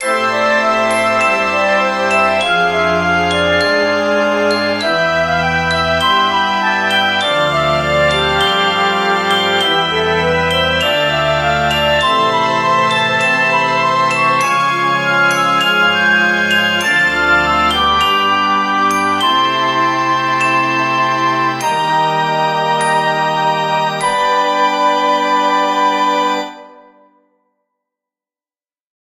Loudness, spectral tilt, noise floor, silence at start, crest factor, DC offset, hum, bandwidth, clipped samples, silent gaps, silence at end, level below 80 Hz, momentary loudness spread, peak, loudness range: -13 LUFS; -3.5 dB/octave; under -90 dBFS; 0 s; 14 dB; under 0.1%; none; 16 kHz; under 0.1%; none; 2.45 s; -42 dBFS; 3 LU; 0 dBFS; 3 LU